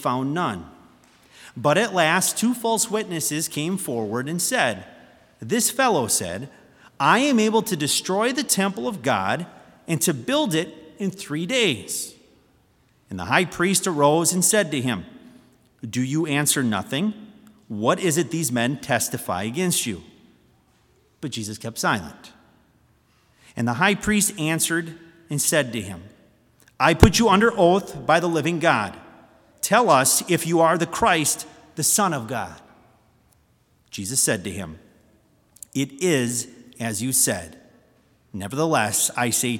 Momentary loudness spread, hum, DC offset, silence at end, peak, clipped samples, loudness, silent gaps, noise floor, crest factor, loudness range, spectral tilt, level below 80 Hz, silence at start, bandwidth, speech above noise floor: 15 LU; none; under 0.1%; 0 s; 0 dBFS; under 0.1%; -21 LUFS; none; -62 dBFS; 24 dB; 7 LU; -3.5 dB/octave; -46 dBFS; 0 s; 18 kHz; 40 dB